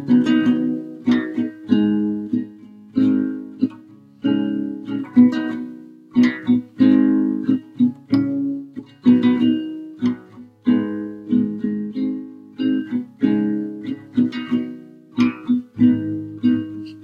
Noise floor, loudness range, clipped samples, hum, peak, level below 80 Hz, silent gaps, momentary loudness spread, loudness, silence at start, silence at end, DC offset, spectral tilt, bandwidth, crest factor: -44 dBFS; 5 LU; under 0.1%; none; -2 dBFS; -62 dBFS; none; 12 LU; -20 LUFS; 0 s; 0 s; under 0.1%; -8 dB/octave; 6.6 kHz; 18 dB